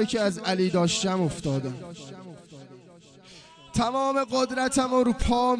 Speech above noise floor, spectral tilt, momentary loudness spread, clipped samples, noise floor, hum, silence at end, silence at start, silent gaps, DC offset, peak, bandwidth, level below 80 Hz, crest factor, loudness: 26 dB; -5 dB/octave; 19 LU; under 0.1%; -51 dBFS; none; 0 s; 0 s; none; under 0.1%; -10 dBFS; 10 kHz; -44 dBFS; 16 dB; -25 LUFS